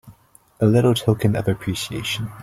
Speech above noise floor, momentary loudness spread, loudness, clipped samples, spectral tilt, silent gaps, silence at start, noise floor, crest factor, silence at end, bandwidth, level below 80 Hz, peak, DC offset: 33 dB; 9 LU; -20 LUFS; under 0.1%; -6 dB/octave; none; 0.05 s; -53 dBFS; 18 dB; 0 s; 15.5 kHz; -48 dBFS; -4 dBFS; under 0.1%